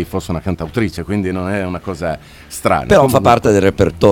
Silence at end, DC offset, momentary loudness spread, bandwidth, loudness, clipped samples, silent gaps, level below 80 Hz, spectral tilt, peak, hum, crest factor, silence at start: 0 s; under 0.1%; 12 LU; 19 kHz; -15 LUFS; under 0.1%; none; -36 dBFS; -6 dB/octave; 0 dBFS; none; 14 dB; 0 s